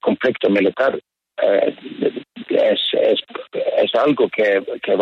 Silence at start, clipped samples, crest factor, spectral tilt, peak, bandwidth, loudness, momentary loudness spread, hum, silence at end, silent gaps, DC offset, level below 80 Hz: 0.05 s; under 0.1%; 14 dB; -6.5 dB/octave; -4 dBFS; 6.2 kHz; -18 LUFS; 7 LU; none; 0 s; none; under 0.1%; -66 dBFS